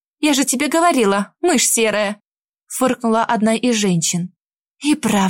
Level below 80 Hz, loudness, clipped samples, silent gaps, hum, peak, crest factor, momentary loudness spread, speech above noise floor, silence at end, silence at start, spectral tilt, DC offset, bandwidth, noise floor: -60 dBFS; -17 LUFS; under 0.1%; 2.27-2.31 s; none; -4 dBFS; 14 dB; 10 LU; 39 dB; 0 s; 0.2 s; -3.5 dB/octave; under 0.1%; 16.5 kHz; -55 dBFS